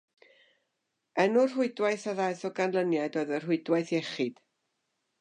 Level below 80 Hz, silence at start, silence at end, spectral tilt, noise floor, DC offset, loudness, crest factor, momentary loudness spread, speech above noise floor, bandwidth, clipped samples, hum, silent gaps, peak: -86 dBFS; 1.15 s; 0.9 s; -5.5 dB/octave; -82 dBFS; under 0.1%; -29 LUFS; 18 dB; 7 LU; 53 dB; 10 kHz; under 0.1%; none; none; -12 dBFS